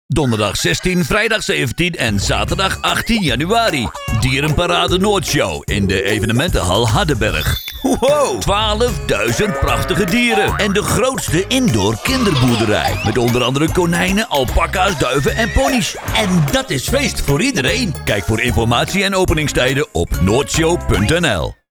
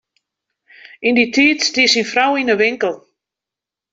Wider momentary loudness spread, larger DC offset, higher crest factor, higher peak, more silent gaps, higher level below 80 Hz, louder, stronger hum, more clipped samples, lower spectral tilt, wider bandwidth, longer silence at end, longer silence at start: second, 3 LU vs 9 LU; neither; about the same, 12 dB vs 16 dB; about the same, -2 dBFS vs -2 dBFS; neither; first, -28 dBFS vs -62 dBFS; about the same, -15 LUFS vs -14 LUFS; neither; neither; first, -4.5 dB/octave vs -2 dB/octave; first, over 20 kHz vs 8 kHz; second, 0.15 s vs 0.95 s; second, 0.1 s vs 1 s